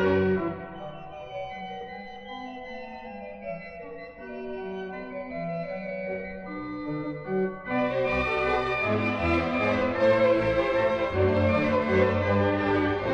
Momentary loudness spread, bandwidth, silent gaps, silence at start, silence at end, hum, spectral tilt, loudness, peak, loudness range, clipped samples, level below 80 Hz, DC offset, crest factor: 16 LU; 7.8 kHz; none; 0 s; 0 s; none; -7.5 dB/octave; -27 LUFS; -10 dBFS; 15 LU; under 0.1%; -48 dBFS; under 0.1%; 16 dB